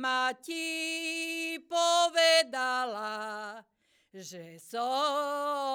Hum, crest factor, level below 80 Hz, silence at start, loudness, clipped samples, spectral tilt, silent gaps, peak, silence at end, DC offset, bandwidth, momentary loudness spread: none; 18 dB; -88 dBFS; 0 s; -29 LUFS; under 0.1%; -1 dB/octave; none; -12 dBFS; 0 s; under 0.1%; over 20 kHz; 21 LU